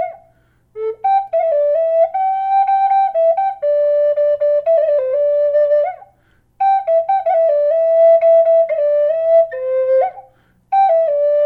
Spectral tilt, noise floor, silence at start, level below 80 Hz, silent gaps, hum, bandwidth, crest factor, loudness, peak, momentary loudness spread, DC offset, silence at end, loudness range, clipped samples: -4.5 dB/octave; -56 dBFS; 0 s; -62 dBFS; none; none; 4.2 kHz; 10 dB; -14 LUFS; -4 dBFS; 6 LU; under 0.1%; 0 s; 3 LU; under 0.1%